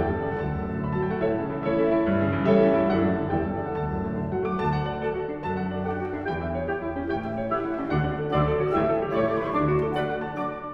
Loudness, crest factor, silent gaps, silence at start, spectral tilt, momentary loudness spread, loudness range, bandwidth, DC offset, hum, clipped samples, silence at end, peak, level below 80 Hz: -26 LUFS; 16 dB; none; 0 s; -9.5 dB/octave; 7 LU; 5 LU; 5.8 kHz; under 0.1%; none; under 0.1%; 0 s; -8 dBFS; -44 dBFS